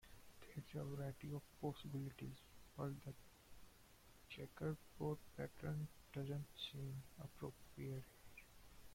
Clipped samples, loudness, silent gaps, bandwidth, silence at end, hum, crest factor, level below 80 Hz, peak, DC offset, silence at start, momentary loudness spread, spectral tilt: under 0.1%; -51 LUFS; none; 16.5 kHz; 0 s; none; 18 dB; -70 dBFS; -32 dBFS; under 0.1%; 0 s; 18 LU; -6.5 dB/octave